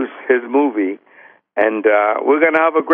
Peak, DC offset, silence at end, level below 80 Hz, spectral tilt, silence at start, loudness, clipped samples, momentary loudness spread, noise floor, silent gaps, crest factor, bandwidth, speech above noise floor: -2 dBFS; under 0.1%; 0 s; -72 dBFS; -7 dB/octave; 0 s; -15 LUFS; under 0.1%; 10 LU; -47 dBFS; none; 14 dB; 3.7 kHz; 32 dB